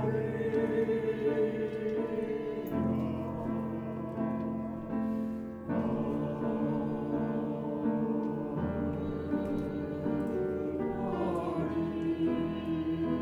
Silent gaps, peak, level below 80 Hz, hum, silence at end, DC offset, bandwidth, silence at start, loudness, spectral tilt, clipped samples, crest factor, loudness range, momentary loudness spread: none; -18 dBFS; -54 dBFS; none; 0 s; under 0.1%; 15.5 kHz; 0 s; -33 LUFS; -9.5 dB/octave; under 0.1%; 14 dB; 2 LU; 5 LU